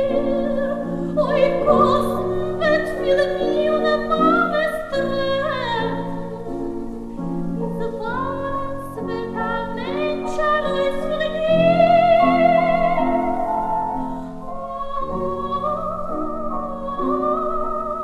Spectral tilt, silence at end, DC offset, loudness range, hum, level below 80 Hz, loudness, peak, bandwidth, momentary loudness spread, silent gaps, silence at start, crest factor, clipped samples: -7 dB/octave; 0 s; under 0.1%; 9 LU; none; -38 dBFS; -21 LUFS; -4 dBFS; 13.5 kHz; 12 LU; none; 0 s; 18 dB; under 0.1%